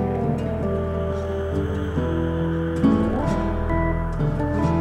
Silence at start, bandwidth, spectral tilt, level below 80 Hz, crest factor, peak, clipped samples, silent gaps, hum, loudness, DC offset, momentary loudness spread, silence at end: 0 s; 9.6 kHz; -9 dB/octave; -30 dBFS; 16 dB; -6 dBFS; under 0.1%; none; none; -23 LUFS; under 0.1%; 5 LU; 0 s